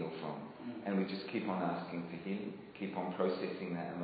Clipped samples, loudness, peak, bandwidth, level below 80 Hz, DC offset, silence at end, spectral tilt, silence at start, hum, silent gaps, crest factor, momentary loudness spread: under 0.1%; -40 LUFS; -20 dBFS; 5 kHz; -80 dBFS; under 0.1%; 0 s; -5.5 dB/octave; 0 s; none; none; 18 dB; 8 LU